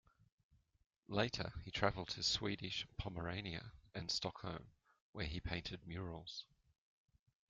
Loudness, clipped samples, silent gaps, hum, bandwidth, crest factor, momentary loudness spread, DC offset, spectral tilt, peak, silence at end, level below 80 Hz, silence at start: -43 LUFS; under 0.1%; 5.01-5.13 s; none; 9 kHz; 26 dB; 12 LU; under 0.1%; -4 dB/octave; -20 dBFS; 1.05 s; -60 dBFS; 1.1 s